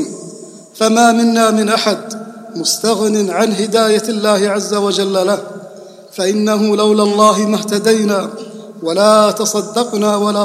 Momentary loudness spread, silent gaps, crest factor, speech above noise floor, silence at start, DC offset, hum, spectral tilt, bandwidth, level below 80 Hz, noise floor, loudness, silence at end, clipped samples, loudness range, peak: 18 LU; none; 14 dB; 22 dB; 0 s; under 0.1%; none; -4 dB/octave; 15.5 kHz; -64 dBFS; -35 dBFS; -13 LUFS; 0 s; under 0.1%; 2 LU; 0 dBFS